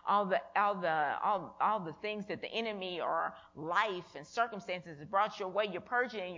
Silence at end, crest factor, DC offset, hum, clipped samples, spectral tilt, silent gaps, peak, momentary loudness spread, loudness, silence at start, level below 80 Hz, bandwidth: 0 s; 20 dB; under 0.1%; none; under 0.1%; -5 dB/octave; none; -16 dBFS; 9 LU; -35 LUFS; 0.05 s; -76 dBFS; 7.6 kHz